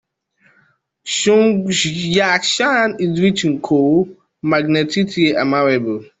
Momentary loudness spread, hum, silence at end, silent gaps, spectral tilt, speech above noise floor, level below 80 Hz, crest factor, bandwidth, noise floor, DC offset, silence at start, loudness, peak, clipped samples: 6 LU; none; 0.15 s; none; -4.5 dB/octave; 43 dB; -56 dBFS; 14 dB; 8.4 kHz; -58 dBFS; under 0.1%; 1.05 s; -16 LUFS; -2 dBFS; under 0.1%